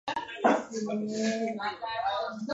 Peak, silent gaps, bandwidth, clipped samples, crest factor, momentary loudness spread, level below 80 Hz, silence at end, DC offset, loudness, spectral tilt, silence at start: -10 dBFS; none; 8 kHz; under 0.1%; 20 dB; 7 LU; -70 dBFS; 0 s; under 0.1%; -31 LUFS; -4.5 dB/octave; 0.05 s